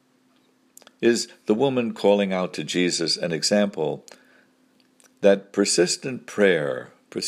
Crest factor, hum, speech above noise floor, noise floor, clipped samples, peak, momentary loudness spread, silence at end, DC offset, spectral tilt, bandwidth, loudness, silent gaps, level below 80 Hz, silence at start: 20 dB; none; 40 dB; -62 dBFS; under 0.1%; -2 dBFS; 9 LU; 0 s; under 0.1%; -4 dB/octave; 15 kHz; -22 LUFS; none; -72 dBFS; 1 s